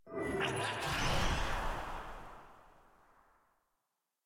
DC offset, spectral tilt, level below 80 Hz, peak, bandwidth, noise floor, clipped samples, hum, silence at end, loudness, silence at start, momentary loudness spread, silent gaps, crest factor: under 0.1%; -4 dB/octave; -44 dBFS; -22 dBFS; 16.5 kHz; -86 dBFS; under 0.1%; none; 1.55 s; -37 LUFS; 0.05 s; 17 LU; none; 18 dB